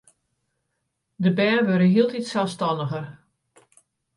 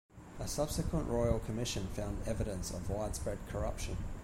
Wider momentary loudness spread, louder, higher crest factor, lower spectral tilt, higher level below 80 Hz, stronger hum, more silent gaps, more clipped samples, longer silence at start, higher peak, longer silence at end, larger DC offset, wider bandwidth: first, 11 LU vs 7 LU; first, -22 LUFS vs -38 LUFS; about the same, 16 dB vs 20 dB; first, -7 dB/octave vs -5.5 dB/octave; second, -70 dBFS vs -44 dBFS; neither; neither; neither; first, 1.2 s vs 0.15 s; first, -8 dBFS vs -18 dBFS; first, 1.05 s vs 0 s; neither; second, 11.5 kHz vs 16.5 kHz